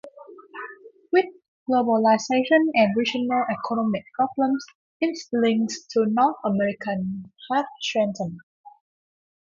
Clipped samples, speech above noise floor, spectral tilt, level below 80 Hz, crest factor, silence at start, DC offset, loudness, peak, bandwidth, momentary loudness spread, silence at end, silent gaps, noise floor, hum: under 0.1%; 22 dB; -5 dB/octave; -68 dBFS; 18 dB; 0.05 s; under 0.1%; -23 LUFS; -6 dBFS; 7.6 kHz; 17 LU; 0.85 s; 1.48-1.66 s, 4.75-5.00 s, 8.43-8.64 s; -45 dBFS; none